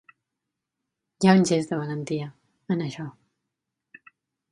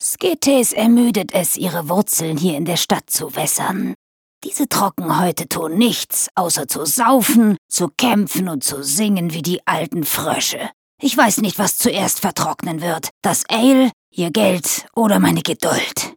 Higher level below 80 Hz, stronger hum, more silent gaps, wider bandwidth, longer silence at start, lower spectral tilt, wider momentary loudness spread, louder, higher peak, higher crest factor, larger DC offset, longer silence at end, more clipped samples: second, -70 dBFS vs -60 dBFS; neither; second, none vs 3.95-4.41 s, 6.31-6.35 s, 7.58-7.69 s, 10.73-10.98 s, 13.11-13.21 s, 13.93-14.12 s; second, 11 kHz vs over 20 kHz; first, 1.2 s vs 0 s; first, -6 dB/octave vs -3.5 dB/octave; first, 19 LU vs 8 LU; second, -24 LUFS vs -17 LUFS; about the same, -2 dBFS vs 0 dBFS; first, 24 dB vs 16 dB; neither; first, 1.4 s vs 0 s; neither